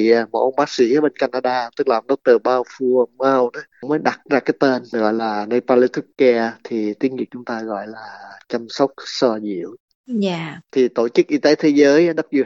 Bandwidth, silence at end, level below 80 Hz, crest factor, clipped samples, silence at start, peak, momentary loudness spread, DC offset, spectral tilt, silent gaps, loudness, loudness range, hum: 7.8 kHz; 0 s; -72 dBFS; 16 dB; under 0.1%; 0 s; -2 dBFS; 12 LU; under 0.1%; -5.5 dB/octave; 9.80-9.88 s, 9.95-10.04 s; -18 LUFS; 6 LU; none